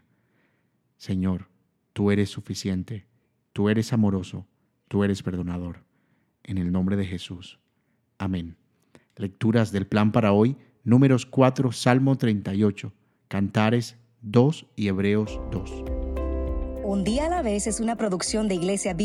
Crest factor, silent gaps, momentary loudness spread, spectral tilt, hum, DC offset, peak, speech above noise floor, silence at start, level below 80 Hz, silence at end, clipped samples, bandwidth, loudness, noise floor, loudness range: 22 dB; none; 15 LU; -6.5 dB/octave; none; under 0.1%; -2 dBFS; 47 dB; 1 s; -40 dBFS; 0 s; under 0.1%; 13 kHz; -25 LUFS; -70 dBFS; 8 LU